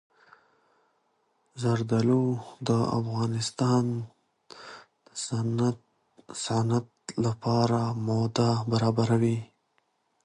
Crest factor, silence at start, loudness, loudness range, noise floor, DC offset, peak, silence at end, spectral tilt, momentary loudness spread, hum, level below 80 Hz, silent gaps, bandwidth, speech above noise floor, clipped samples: 18 dB; 1.55 s; -27 LUFS; 4 LU; -73 dBFS; under 0.1%; -10 dBFS; 0.8 s; -6.5 dB/octave; 15 LU; none; -62 dBFS; none; 11 kHz; 46 dB; under 0.1%